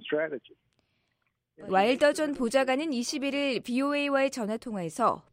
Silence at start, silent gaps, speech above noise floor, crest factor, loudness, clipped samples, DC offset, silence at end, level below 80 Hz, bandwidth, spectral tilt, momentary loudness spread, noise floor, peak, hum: 0 s; none; 50 dB; 20 dB; -28 LUFS; under 0.1%; under 0.1%; 0.15 s; -66 dBFS; 16 kHz; -4 dB/octave; 9 LU; -78 dBFS; -10 dBFS; none